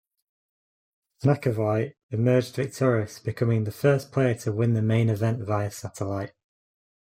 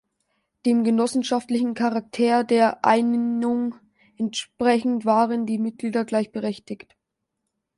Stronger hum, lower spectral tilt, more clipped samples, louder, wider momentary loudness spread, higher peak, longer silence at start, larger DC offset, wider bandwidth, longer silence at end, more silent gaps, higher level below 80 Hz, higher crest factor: neither; first, -7.5 dB/octave vs -5 dB/octave; neither; second, -25 LUFS vs -22 LUFS; about the same, 8 LU vs 10 LU; second, -8 dBFS vs -4 dBFS; first, 1.2 s vs 0.65 s; neither; first, 15.5 kHz vs 11.5 kHz; second, 0.75 s vs 1 s; first, 2.03-2.09 s vs none; first, -62 dBFS vs -68 dBFS; about the same, 18 dB vs 18 dB